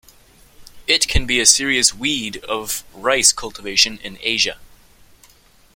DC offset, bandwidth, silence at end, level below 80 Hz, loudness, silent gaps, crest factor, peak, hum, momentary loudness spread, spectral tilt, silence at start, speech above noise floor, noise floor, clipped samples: under 0.1%; 17 kHz; 1.1 s; -36 dBFS; -16 LUFS; none; 20 dB; 0 dBFS; none; 13 LU; -1 dB/octave; 0.6 s; 33 dB; -51 dBFS; under 0.1%